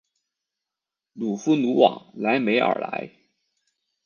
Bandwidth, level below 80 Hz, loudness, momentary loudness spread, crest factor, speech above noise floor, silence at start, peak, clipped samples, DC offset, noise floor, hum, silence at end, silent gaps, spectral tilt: 7 kHz; -74 dBFS; -22 LUFS; 13 LU; 22 dB; 65 dB; 1.15 s; -2 dBFS; under 0.1%; under 0.1%; -87 dBFS; none; 1 s; none; -5.5 dB/octave